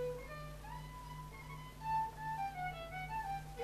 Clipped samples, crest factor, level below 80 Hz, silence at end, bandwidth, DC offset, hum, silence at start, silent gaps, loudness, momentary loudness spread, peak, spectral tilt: under 0.1%; 14 dB; -56 dBFS; 0 s; 14 kHz; under 0.1%; none; 0 s; none; -44 LUFS; 11 LU; -28 dBFS; -5 dB/octave